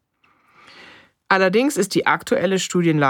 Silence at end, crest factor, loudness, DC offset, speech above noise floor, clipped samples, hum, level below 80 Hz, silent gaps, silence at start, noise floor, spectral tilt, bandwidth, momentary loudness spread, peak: 0 s; 18 dB; -19 LUFS; under 0.1%; 43 dB; under 0.1%; none; -66 dBFS; none; 1.3 s; -61 dBFS; -4.5 dB/octave; 18.5 kHz; 3 LU; -2 dBFS